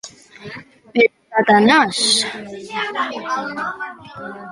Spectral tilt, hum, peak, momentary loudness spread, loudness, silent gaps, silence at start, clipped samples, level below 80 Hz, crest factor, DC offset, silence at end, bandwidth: -2.5 dB/octave; none; -2 dBFS; 22 LU; -17 LUFS; none; 0.05 s; under 0.1%; -60 dBFS; 18 dB; under 0.1%; 0 s; 11.5 kHz